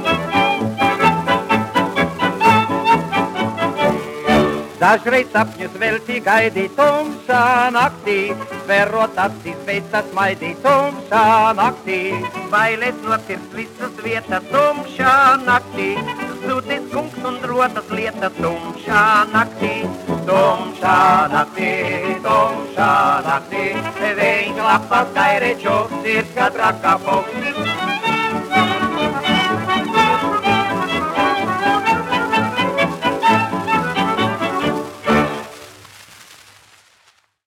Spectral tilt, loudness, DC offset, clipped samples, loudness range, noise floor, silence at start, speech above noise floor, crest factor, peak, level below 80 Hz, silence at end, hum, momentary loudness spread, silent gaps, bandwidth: -5 dB/octave; -17 LUFS; under 0.1%; under 0.1%; 3 LU; -56 dBFS; 0 s; 39 dB; 16 dB; 0 dBFS; -52 dBFS; 1.1 s; none; 9 LU; none; 17 kHz